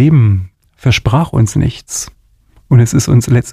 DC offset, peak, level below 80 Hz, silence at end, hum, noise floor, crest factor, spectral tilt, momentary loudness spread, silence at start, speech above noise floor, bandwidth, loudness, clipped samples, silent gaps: under 0.1%; 0 dBFS; -32 dBFS; 0 s; none; -48 dBFS; 12 dB; -6 dB/octave; 11 LU; 0 s; 38 dB; 14.5 kHz; -12 LUFS; under 0.1%; none